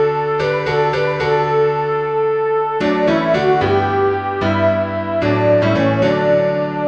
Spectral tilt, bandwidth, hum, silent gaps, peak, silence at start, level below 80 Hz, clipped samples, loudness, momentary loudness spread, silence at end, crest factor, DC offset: -7.5 dB/octave; 8 kHz; none; none; -4 dBFS; 0 s; -46 dBFS; under 0.1%; -16 LUFS; 4 LU; 0 s; 12 dB; 0.2%